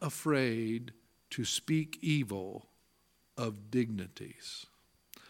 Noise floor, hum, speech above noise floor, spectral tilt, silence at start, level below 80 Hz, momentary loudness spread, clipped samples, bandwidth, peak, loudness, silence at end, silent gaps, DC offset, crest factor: -72 dBFS; 60 Hz at -65 dBFS; 37 dB; -5 dB/octave; 0 s; -74 dBFS; 16 LU; under 0.1%; 17.5 kHz; -16 dBFS; -35 LUFS; 0 s; none; under 0.1%; 20 dB